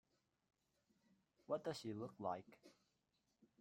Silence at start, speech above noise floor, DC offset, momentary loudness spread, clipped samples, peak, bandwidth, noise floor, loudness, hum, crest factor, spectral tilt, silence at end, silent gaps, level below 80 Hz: 1.5 s; 38 dB; under 0.1%; 6 LU; under 0.1%; -30 dBFS; 14.5 kHz; -86 dBFS; -48 LUFS; none; 22 dB; -6 dB/octave; 0.9 s; none; -88 dBFS